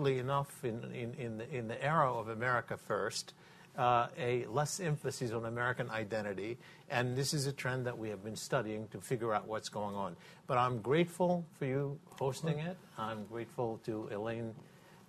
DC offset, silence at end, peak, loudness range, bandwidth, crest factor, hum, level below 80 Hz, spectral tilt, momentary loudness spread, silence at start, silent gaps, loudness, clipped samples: under 0.1%; 0.05 s; -16 dBFS; 3 LU; 14 kHz; 20 dB; none; -70 dBFS; -5 dB/octave; 11 LU; 0 s; none; -37 LUFS; under 0.1%